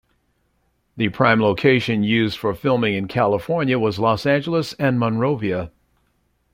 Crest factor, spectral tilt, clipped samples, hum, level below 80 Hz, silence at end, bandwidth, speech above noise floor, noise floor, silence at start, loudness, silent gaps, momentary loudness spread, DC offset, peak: 18 dB; -7 dB/octave; under 0.1%; none; -52 dBFS; 0.85 s; 16 kHz; 47 dB; -66 dBFS; 0.95 s; -19 LUFS; none; 7 LU; under 0.1%; -2 dBFS